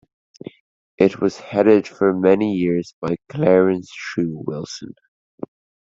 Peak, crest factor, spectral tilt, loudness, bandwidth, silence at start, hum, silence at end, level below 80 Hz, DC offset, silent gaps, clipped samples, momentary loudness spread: -2 dBFS; 18 dB; -7 dB/octave; -19 LUFS; 7.8 kHz; 1 s; none; 0.45 s; -60 dBFS; under 0.1%; 2.93-3.02 s, 5.08-5.38 s; under 0.1%; 22 LU